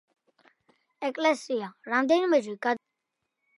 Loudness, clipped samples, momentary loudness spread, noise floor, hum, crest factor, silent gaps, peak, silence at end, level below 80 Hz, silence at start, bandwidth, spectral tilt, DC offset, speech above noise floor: -27 LUFS; under 0.1%; 11 LU; -83 dBFS; none; 18 dB; none; -10 dBFS; 0.8 s; -82 dBFS; 1 s; 11.5 kHz; -4 dB/octave; under 0.1%; 57 dB